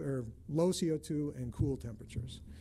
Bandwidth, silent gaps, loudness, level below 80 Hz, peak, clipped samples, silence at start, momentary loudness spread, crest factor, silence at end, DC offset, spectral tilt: 15.5 kHz; none; -36 LUFS; -52 dBFS; -20 dBFS; under 0.1%; 0 s; 12 LU; 16 dB; 0 s; under 0.1%; -6.5 dB/octave